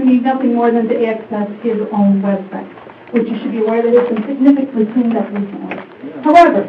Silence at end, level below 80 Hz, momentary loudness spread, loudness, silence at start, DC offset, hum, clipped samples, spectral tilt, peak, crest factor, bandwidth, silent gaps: 0 s; -58 dBFS; 14 LU; -14 LUFS; 0 s; under 0.1%; none; under 0.1%; -8.5 dB/octave; 0 dBFS; 14 dB; 7.2 kHz; none